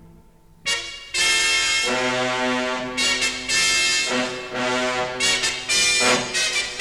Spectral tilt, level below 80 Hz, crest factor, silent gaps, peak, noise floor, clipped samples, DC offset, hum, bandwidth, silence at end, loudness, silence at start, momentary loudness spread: -0.5 dB/octave; -50 dBFS; 16 dB; none; -6 dBFS; -50 dBFS; under 0.1%; under 0.1%; none; 16.5 kHz; 0 s; -19 LUFS; 0 s; 8 LU